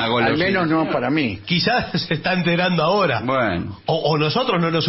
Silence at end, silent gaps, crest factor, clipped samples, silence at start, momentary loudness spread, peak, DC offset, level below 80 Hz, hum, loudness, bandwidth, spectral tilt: 0 s; none; 14 dB; under 0.1%; 0 s; 4 LU; -6 dBFS; under 0.1%; -50 dBFS; none; -19 LUFS; 6 kHz; -8.5 dB/octave